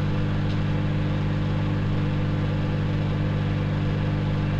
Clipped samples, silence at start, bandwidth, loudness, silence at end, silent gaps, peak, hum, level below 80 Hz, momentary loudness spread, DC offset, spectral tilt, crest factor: under 0.1%; 0 s; 7.2 kHz; -25 LUFS; 0 s; none; -12 dBFS; 50 Hz at -25 dBFS; -36 dBFS; 0 LU; under 0.1%; -8.5 dB/octave; 10 dB